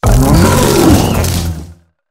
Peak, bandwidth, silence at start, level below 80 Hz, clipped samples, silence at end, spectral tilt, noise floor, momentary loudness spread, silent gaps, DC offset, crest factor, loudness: 0 dBFS; 16.5 kHz; 0.05 s; -18 dBFS; 0.2%; 0.4 s; -5.5 dB/octave; -34 dBFS; 11 LU; none; under 0.1%; 10 dB; -10 LUFS